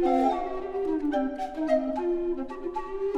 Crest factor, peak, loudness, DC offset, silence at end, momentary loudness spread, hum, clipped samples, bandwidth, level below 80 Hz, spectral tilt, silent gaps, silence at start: 16 dB; -12 dBFS; -29 LUFS; under 0.1%; 0 s; 8 LU; none; under 0.1%; 9 kHz; -48 dBFS; -6 dB/octave; none; 0 s